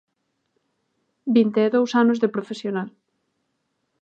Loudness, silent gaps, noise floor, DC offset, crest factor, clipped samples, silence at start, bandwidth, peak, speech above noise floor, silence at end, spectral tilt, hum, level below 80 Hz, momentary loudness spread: -21 LUFS; none; -74 dBFS; under 0.1%; 18 dB; under 0.1%; 1.25 s; 7.8 kHz; -6 dBFS; 54 dB; 1.15 s; -6.5 dB/octave; none; -78 dBFS; 12 LU